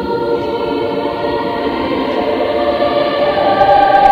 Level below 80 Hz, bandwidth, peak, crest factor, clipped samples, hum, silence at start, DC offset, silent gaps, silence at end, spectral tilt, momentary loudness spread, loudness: -40 dBFS; 7.4 kHz; 0 dBFS; 14 dB; under 0.1%; none; 0 s; under 0.1%; none; 0 s; -6.5 dB/octave; 8 LU; -14 LUFS